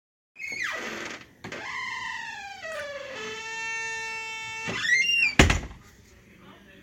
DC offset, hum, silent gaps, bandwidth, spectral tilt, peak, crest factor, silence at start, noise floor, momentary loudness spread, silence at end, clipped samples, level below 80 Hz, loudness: under 0.1%; none; none; 16.5 kHz; -3 dB/octave; 0 dBFS; 28 dB; 0.35 s; -53 dBFS; 17 LU; 0 s; under 0.1%; -40 dBFS; -27 LUFS